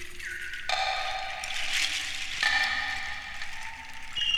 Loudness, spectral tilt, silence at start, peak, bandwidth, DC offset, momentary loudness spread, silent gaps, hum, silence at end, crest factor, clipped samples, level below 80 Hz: -29 LUFS; 0.5 dB/octave; 0 s; -12 dBFS; 17.5 kHz; under 0.1%; 12 LU; none; none; 0 s; 20 dB; under 0.1%; -48 dBFS